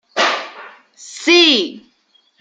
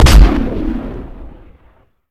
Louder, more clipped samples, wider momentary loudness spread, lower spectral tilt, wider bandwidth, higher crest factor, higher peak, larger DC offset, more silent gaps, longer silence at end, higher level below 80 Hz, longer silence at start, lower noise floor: about the same, -13 LUFS vs -14 LUFS; second, under 0.1% vs 2%; second, 21 LU vs 24 LU; second, -1 dB/octave vs -5.5 dB/octave; second, 9.2 kHz vs 15 kHz; about the same, 16 dB vs 12 dB; about the same, 0 dBFS vs 0 dBFS; neither; neither; second, 0.6 s vs 0.85 s; second, -70 dBFS vs -14 dBFS; first, 0.15 s vs 0 s; first, -58 dBFS vs -50 dBFS